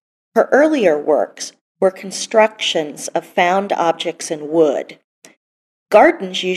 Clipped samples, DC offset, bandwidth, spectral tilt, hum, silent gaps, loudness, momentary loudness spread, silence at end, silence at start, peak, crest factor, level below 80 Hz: under 0.1%; under 0.1%; 13.5 kHz; -3.5 dB/octave; none; 1.61-1.75 s, 5.04-5.22 s, 5.37-5.86 s; -16 LUFS; 13 LU; 0 s; 0.35 s; 0 dBFS; 16 dB; -66 dBFS